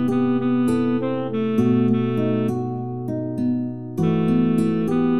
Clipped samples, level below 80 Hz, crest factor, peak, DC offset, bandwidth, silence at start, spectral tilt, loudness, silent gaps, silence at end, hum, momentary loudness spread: under 0.1%; -56 dBFS; 12 dB; -8 dBFS; 1%; 11.5 kHz; 0 s; -9 dB/octave; -21 LUFS; none; 0 s; none; 8 LU